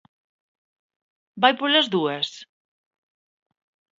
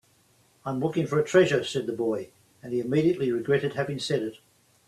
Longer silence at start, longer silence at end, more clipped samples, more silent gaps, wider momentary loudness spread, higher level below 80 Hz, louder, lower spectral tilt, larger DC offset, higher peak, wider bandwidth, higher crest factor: first, 1.35 s vs 0.65 s; first, 1.55 s vs 0.5 s; neither; neither; second, 10 LU vs 13 LU; second, -80 dBFS vs -66 dBFS; first, -21 LUFS vs -26 LUFS; second, -4 dB/octave vs -6 dB/octave; neither; first, 0 dBFS vs -8 dBFS; second, 7.8 kHz vs 13 kHz; first, 26 dB vs 20 dB